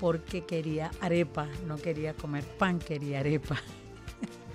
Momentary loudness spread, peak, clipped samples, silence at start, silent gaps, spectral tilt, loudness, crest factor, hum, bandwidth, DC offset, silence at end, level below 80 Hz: 12 LU; -14 dBFS; under 0.1%; 0 s; none; -7 dB/octave; -33 LUFS; 18 dB; none; 14 kHz; under 0.1%; 0 s; -52 dBFS